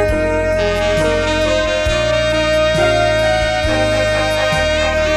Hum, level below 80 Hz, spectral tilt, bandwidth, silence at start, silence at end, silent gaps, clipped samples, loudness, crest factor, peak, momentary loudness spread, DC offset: none; -26 dBFS; -4.5 dB/octave; 14 kHz; 0 s; 0 s; none; under 0.1%; -15 LUFS; 10 dB; -4 dBFS; 2 LU; under 0.1%